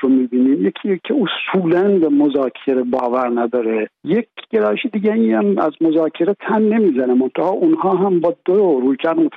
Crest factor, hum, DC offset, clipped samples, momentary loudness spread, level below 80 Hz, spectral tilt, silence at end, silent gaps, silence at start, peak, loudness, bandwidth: 10 dB; none; under 0.1%; under 0.1%; 5 LU; -66 dBFS; -9.5 dB/octave; 0 s; none; 0 s; -6 dBFS; -16 LUFS; 4.3 kHz